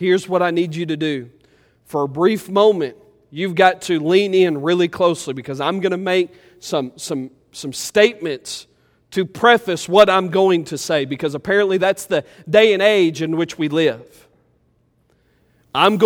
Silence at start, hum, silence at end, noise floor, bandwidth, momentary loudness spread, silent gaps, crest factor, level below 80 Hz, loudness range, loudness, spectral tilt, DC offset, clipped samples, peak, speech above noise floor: 0 s; none; 0 s; -61 dBFS; 17 kHz; 13 LU; none; 18 dB; -60 dBFS; 5 LU; -18 LUFS; -4.5 dB/octave; under 0.1%; under 0.1%; 0 dBFS; 44 dB